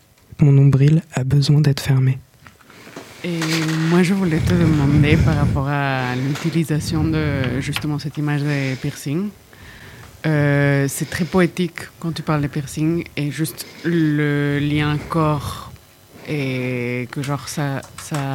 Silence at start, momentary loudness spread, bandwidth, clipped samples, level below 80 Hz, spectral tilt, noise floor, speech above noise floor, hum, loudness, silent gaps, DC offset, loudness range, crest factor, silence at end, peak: 0.4 s; 12 LU; 16 kHz; under 0.1%; -40 dBFS; -6.5 dB/octave; -46 dBFS; 28 dB; none; -19 LUFS; none; under 0.1%; 5 LU; 18 dB; 0 s; -2 dBFS